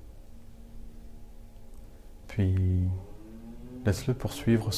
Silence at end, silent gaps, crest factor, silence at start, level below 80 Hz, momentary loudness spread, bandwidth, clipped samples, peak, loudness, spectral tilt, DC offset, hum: 0 s; none; 18 dB; 0 s; -46 dBFS; 25 LU; 14.5 kHz; under 0.1%; -14 dBFS; -30 LUFS; -6.5 dB/octave; under 0.1%; none